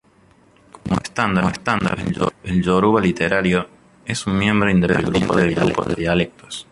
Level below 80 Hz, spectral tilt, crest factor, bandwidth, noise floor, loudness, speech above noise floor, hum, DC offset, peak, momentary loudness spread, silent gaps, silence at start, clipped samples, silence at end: -40 dBFS; -6 dB/octave; 18 dB; 11.5 kHz; -53 dBFS; -19 LUFS; 35 dB; none; under 0.1%; -2 dBFS; 9 LU; none; 0.85 s; under 0.1%; 0.1 s